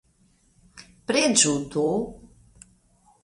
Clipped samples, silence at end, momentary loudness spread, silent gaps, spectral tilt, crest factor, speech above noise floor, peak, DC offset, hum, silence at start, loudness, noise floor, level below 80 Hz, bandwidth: under 0.1%; 0.95 s; 16 LU; none; -2.5 dB/octave; 24 dB; 40 dB; -4 dBFS; under 0.1%; none; 0.75 s; -22 LUFS; -63 dBFS; -56 dBFS; 11.5 kHz